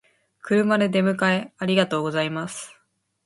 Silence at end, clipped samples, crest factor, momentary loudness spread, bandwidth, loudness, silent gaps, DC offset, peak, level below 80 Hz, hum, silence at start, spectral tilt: 0.55 s; under 0.1%; 20 dB; 15 LU; 11.5 kHz; -22 LUFS; none; under 0.1%; -4 dBFS; -66 dBFS; none; 0.45 s; -5.5 dB/octave